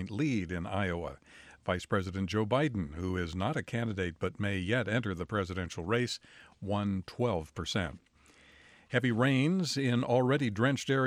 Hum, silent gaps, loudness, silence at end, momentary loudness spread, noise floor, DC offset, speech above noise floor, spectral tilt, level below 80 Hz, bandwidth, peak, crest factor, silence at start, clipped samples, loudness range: none; none; -32 LUFS; 0 s; 8 LU; -61 dBFS; under 0.1%; 29 dB; -6 dB/octave; -56 dBFS; 15 kHz; -14 dBFS; 18 dB; 0 s; under 0.1%; 4 LU